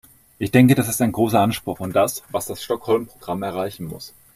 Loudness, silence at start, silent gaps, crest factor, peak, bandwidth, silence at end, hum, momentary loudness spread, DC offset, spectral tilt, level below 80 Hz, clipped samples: -20 LUFS; 0.4 s; none; 18 dB; -2 dBFS; 16 kHz; 0.25 s; none; 14 LU; under 0.1%; -5.5 dB/octave; -54 dBFS; under 0.1%